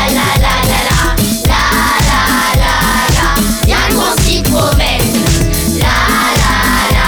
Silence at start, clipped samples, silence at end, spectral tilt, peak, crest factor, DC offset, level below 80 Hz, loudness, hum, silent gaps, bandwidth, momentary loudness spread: 0 s; under 0.1%; 0 s; -3.5 dB/octave; 0 dBFS; 10 dB; under 0.1%; -16 dBFS; -10 LUFS; none; none; over 20 kHz; 2 LU